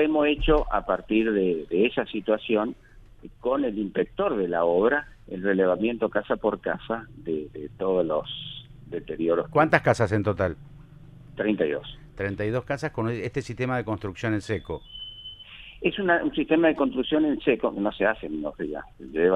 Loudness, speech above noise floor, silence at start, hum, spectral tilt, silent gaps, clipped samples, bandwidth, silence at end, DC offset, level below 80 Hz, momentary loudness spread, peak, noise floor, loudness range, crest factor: -26 LUFS; 22 dB; 0 s; none; -7 dB/octave; none; under 0.1%; 10.5 kHz; 0 s; under 0.1%; -44 dBFS; 14 LU; -4 dBFS; -47 dBFS; 5 LU; 22 dB